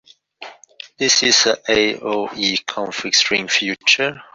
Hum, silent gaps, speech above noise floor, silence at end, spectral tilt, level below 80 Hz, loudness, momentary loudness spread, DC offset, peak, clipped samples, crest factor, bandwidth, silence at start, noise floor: none; none; 23 dB; 0.1 s; -1 dB/octave; -56 dBFS; -16 LUFS; 10 LU; under 0.1%; -2 dBFS; under 0.1%; 18 dB; 7.8 kHz; 0.4 s; -41 dBFS